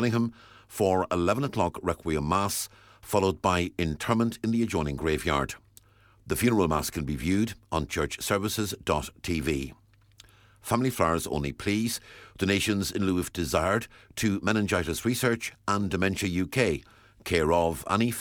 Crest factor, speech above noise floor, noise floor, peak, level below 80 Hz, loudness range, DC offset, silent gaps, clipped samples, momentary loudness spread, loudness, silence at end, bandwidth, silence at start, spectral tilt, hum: 20 dB; 30 dB; -57 dBFS; -8 dBFS; -46 dBFS; 3 LU; under 0.1%; none; under 0.1%; 7 LU; -28 LUFS; 0 s; 19 kHz; 0 s; -5 dB/octave; none